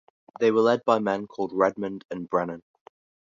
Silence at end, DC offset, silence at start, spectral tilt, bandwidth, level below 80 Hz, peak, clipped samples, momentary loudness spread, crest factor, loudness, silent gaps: 0.65 s; under 0.1%; 0.4 s; -6.5 dB/octave; 7.4 kHz; -68 dBFS; -6 dBFS; under 0.1%; 13 LU; 20 dB; -25 LUFS; 2.05-2.09 s